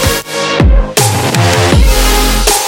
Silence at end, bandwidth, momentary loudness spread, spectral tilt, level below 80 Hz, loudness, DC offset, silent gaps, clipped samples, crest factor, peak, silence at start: 0 s; 17.5 kHz; 4 LU; -3.5 dB/octave; -12 dBFS; -10 LUFS; under 0.1%; none; 0.1%; 8 dB; 0 dBFS; 0 s